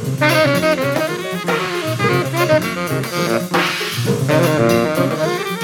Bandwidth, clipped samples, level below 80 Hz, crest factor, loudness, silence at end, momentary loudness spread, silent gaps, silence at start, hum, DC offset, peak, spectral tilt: 18.5 kHz; under 0.1%; -54 dBFS; 14 dB; -17 LUFS; 0 s; 6 LU; none; 0 s; none; under 0.1%; -2 dBFS; -5 dB/octave